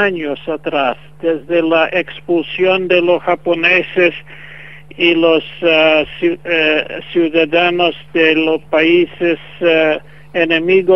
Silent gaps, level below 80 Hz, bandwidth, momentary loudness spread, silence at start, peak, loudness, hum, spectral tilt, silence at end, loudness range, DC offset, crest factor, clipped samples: none; -52 dBFS; 6 kHz; 8 LU; 0 s; 0 dBFS; -14 LUFS; none; -6.5 dB/octave; 0 s; 2 LU; 1%; 14 dB; under 0.1%